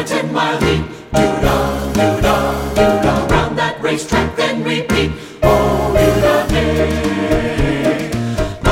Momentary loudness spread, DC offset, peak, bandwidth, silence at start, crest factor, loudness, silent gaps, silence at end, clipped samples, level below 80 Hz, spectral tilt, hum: 5 LU; under 0.1%; 0 dBFS; 17 kHz; 0 s; 14 dB; -15 LUFS; none; 0 s; under 0.1%; -26 dBFS; -5.5 dB/octave; none